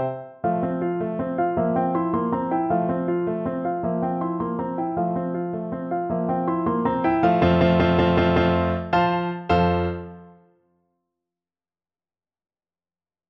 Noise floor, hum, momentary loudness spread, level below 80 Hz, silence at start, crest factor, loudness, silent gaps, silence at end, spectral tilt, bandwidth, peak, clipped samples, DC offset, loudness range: under -90 dBFS; none; 9 LU; -44 dBFS; 0 s; 18 dB; -23 LUFS; none; 3 s; -9 dB/octave; 5.8 kHz; -4 dBFS; under 0.1%; under 0.1%; 6 LU